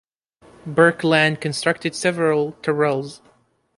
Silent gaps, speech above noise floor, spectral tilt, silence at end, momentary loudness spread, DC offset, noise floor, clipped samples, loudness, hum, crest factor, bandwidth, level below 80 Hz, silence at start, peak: none; 40 dB; -5 dB/octave; 0.6 s; 9 LU; under 0.1%; -60 dBFS; under 0.1%; -19 LUFS; none; 20 dB; 11.5 kHz; -62 dBFS; 0.65 s; -2 dBFS